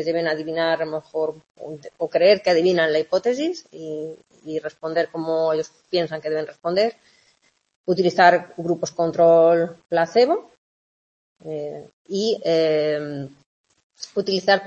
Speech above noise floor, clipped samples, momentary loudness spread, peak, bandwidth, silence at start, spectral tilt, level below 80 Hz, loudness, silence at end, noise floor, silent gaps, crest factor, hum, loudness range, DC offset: 43 dB; under 0.1%; 18 LU; -2 dBFS; 8 kHz; 0 s; -5 dB/octave; -68 dBFS; -21 LUFS; 0 s; -63 dBFS; 1.50-1.55 s, 7.76-7.84 s, 10.58-11.36 s, 11.93-12.05 s, 13.46-13.64 s, 13.83-13.90 s; 20 dB; none; 7 LU; under 0.1%